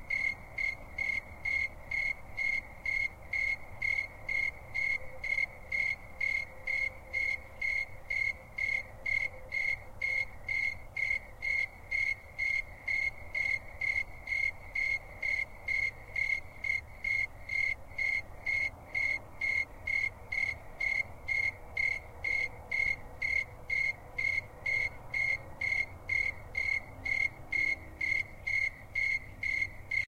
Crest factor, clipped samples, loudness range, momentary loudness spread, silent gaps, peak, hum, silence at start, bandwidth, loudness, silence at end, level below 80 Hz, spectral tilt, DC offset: 14 dB; under 0.1%; 1 LU; 3 LU; none; -20 dBFS; none; 0 s; 16 kHz; -32 LUFS; 0 s; -52 dBFS; -3 dB/octave; under 0.1%